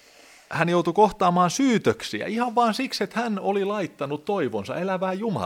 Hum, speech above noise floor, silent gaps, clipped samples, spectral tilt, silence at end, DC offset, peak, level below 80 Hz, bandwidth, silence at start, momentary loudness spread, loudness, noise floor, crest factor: none; 28 dB; none; under 0.1%; -5.5 dB/octave; 0 s; under 0.1%; -4 dBFS; -60 dBFS; 16.5 kHz; 0.5 s; 9 LU; -24 LUFS; -52 dBFS; 20 dB